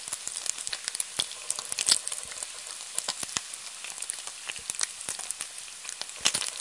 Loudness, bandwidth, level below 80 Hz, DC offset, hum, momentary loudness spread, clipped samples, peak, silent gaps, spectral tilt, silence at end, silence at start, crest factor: -31 LUFS; 11.5 kHz; -70 dBFS; under 0.1%; none; 11 LU; under 0.1%; -2 dBFS; none; 1.5 dB/octave; 0 s; 0 s; 32 dB